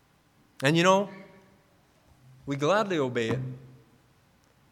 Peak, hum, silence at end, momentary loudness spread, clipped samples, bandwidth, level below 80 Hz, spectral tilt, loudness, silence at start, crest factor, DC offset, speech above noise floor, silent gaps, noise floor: -8 dBFS; none; 1.05 s; 22 LU; under 0.1%; 15 kHz; -66 dBFS; -5 dB/octave; -26 LUFS; 0.6 s; 22 dB; under 0.1%; 38 dB; none; -63 dBFS